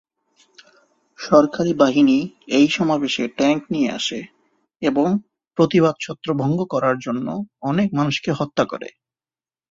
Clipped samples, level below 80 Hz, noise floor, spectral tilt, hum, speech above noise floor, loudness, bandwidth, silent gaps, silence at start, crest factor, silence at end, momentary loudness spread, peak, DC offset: under 0.1%; -58 dBFS; under -90 dBFS; -6 dB/octave; none; over 71 dB; -19 LUFS; 7.6 kHz; none; 1.2 s; 18 dB; 0.8 s; 10 LU; -2 dBFS; under 0.1%